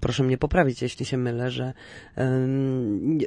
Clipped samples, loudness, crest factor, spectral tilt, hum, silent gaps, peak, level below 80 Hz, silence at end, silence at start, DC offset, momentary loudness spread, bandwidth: under 0.1%; -25 LUFS; 18 dB; -7 dB/octave; none; none; -6 dBFS; -42 dBFS; 0 s; 0 s; under 0.1%; 10 LU; 10.5 kHz